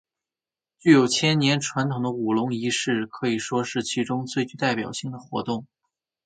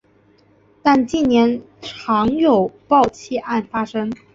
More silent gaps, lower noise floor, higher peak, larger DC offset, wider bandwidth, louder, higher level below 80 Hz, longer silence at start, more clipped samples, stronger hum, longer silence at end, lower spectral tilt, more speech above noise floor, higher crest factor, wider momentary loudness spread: neither; first, under -90 dBFS vs -55 dBFS; about the same, -2 dBFS vs -2 dBFS; neither; first, 9.4 kHz vs 7.8 kHz; second, -24 LUFS vs -18 LUFS; second, -66 dBFS vs -50 dBFS; about the same, 0.85 s vs 0.85 s; neither; neither; first, 0.6 s vs 0.2 s; second, -4.5 dB/octave vs -6 dB/octave; first, over 67 dB vs 37 dB; first, 22 dB vs 16 dB; about the same, 13 LU vs 11 LU